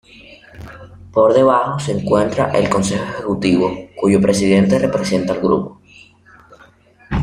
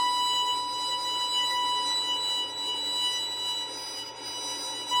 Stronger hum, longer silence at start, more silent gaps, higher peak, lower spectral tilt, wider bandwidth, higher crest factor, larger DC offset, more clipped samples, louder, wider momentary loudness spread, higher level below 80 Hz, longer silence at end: neither; first, 0.3 s vs 0 s; neither; first, -2 dBFS vs -16 dBFS; first, -6 dB/octave vs 1 dB/octave; second, 12 kHz vs 16 kHz; about the same, 16 dB vs 14 dB; neither; neither; first, -16 LUFS vs -27 LUFS; first, 11 LU vs 8 LU; first, -40 dBFS vs -72 dBFS; about the same, 0 s vs 0 s